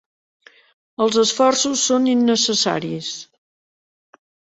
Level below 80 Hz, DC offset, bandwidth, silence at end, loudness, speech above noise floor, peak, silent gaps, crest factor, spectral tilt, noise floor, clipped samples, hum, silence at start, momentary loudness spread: -66 dBFS; under 0.1%; 8.2 kHz; 1.35 s; -18 LUFS; over 72 dB; -2 dBFS; none; 18 dB; -2.5 dB/octave; under -90 dBFS; under 0.1%; none; 1 s; 13 LU